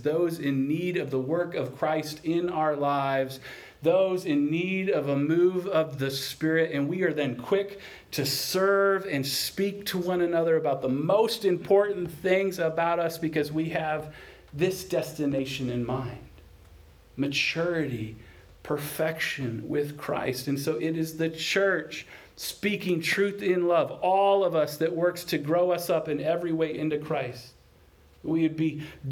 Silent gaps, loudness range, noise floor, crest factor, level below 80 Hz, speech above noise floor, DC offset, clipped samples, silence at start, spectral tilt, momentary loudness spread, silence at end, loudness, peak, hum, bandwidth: none; 5 LU; -57 dBFS; 16 dB; -60 dBFS; 30 dB; under 0.1%; under 0.1%; 0 s; -5 dB/octave; 9 LU; 0 s; -27 LUFS; -10 dBFS; none; over 20 kHz